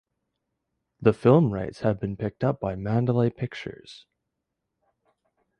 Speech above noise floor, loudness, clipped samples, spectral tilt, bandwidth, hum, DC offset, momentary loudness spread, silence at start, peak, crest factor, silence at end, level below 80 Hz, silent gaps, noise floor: 58 dB; -25 LUFS; under 0.1%; -9 dB/octave; 9.4 kHz; none; under 0.1%; 14 LU; 1 s; -4 dBFS; 22 dB; 1.6 s; -54 dBFS; none; -82 dBFS